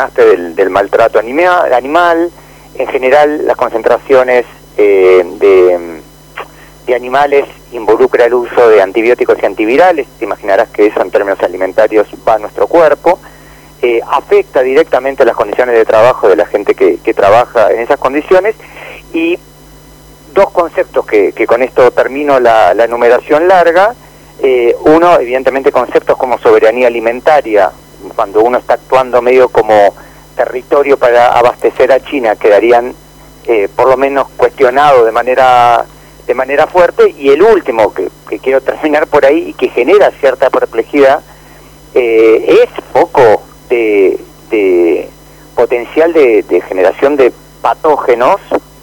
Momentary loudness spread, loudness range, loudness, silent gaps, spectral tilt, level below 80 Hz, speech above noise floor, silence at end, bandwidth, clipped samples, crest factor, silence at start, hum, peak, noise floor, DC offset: 9 LU; 2 LU; -9 LUFS; none; -5.5 dB/octave; -42 dBFS; 28 dB; 0.25 s; 19.5 kHz; under 0.1%; 8 dB; 0 s; none; 0 dBFS; -36 dBFS; under 0.1%